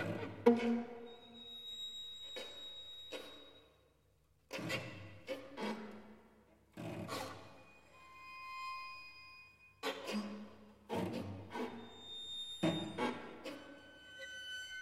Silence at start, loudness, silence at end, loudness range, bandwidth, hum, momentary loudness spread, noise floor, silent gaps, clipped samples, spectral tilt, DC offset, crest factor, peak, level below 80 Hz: 0 s; -43 LUFS; 0 s; 6 LU; 16 kHz; none; 19 LU; -73 dBFS; none; under 0.1%; -5 dB/octave; under 0.1%; 30 dB; -14 dBFS; -76 dBFS